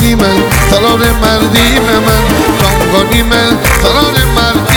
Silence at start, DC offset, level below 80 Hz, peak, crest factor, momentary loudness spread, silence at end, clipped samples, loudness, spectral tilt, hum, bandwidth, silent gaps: 0 s; 0.4%; -16 dBFS; 0 dBFS; 8 dB; 2 LU; 0 s; 0.2%; -8 LUFS; -4.5 dB/octave; none; over 20 kHz; none